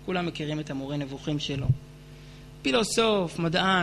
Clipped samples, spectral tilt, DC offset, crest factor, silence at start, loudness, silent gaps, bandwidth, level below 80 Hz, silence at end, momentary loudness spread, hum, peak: under 0.1%; -5 dB/octave; under 0.1%; 18 dB; 0 s; -27 LUFS; none; 13 kHz; -50 dBFS; 0 s; 23 LU; none; -10 dBFS